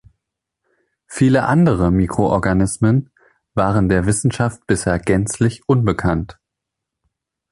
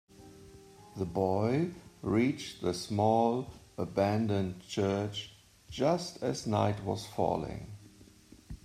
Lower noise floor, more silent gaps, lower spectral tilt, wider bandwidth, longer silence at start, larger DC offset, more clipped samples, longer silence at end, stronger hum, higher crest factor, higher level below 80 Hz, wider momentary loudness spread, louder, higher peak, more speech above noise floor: first, -81 dBFS vs -57 dBFS; neither; about the same, -6.5 dB/octave vs -6.5 dB/octave; second, 11.5 kHz vs 14.5 kHz; first, 1.1 s vs 0.2 s; neither; neither; first, 1.2 s vs 0.1 s; neither; about the same, 16 dB vs 20 dB; first, -36 dBFS vs -60 dBFS; second, 6 LU vs 16 LU; first, -17 LUFS vs -32 LUFS; first, -2 dBFS vs -12 dBFS; first, 65 dB vs 26 dB